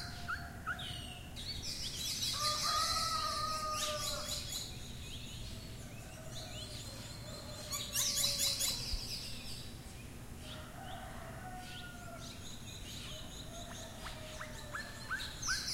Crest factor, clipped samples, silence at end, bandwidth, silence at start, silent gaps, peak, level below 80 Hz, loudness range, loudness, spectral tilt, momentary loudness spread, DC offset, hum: 20 dB; under 0.1%; 0 s; 16 kHz; 0 s; none; -20 dBFS; -52 dBFS; 12 LU; -39 LUFS; -1.5 dB/octave; 15 LU; under 0.1%; none